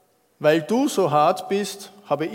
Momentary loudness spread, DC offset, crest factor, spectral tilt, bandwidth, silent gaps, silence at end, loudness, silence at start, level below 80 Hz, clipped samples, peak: 10 LU; under 0.1%; 18 dB; -5 dB/octave; 16.5 kHz; none; 0 s; -21 LUFS; 0.4 s; -74 dBFS; under 0.1%; -4 dBFS